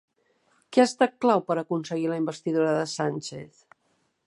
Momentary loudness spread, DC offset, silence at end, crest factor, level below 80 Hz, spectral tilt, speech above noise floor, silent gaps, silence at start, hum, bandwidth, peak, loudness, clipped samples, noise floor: 8 LU; under 0.1%; 0.8 s; 20 dB; -76 dBFS; -5.5 dB/octave; 46 dB; none; 0.7 s; none; 11.5 kHz; -6 dBFS; -25 LUFS; under 0.1%; -71 dBFS